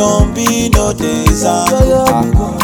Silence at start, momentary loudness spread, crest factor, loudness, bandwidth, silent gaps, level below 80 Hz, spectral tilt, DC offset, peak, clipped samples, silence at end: 0 s; 3 LU; 10 dB; -12 LUFS; over 20 kHz; none; -18 dBFS; -5 dB/octave; under 0.1%; 0 dBFS; 0.2%; 0 s